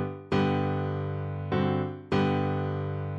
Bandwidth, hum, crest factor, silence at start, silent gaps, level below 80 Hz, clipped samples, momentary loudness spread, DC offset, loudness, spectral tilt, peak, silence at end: 7.4 kHz; none; 16 dB; 0 s; none; -60 dBFS; under 0.1%; 6 LU; under 0.1%; -29 LUFS; -8.5 dB/octave; -12 dBFS; 0 s